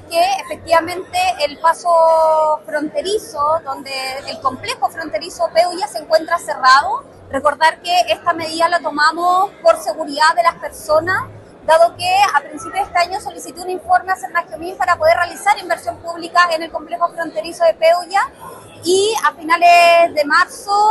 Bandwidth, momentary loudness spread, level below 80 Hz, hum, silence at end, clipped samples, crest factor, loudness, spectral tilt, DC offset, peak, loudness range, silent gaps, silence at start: 13 kHz; 12 LU; -54 dBFS; none; 0 s; under 0.1%; 16 dB; -16 LUFS; -2.5 dB/octave; under 0.1%; 0 dBFS; 4 LU; none; 0.05 s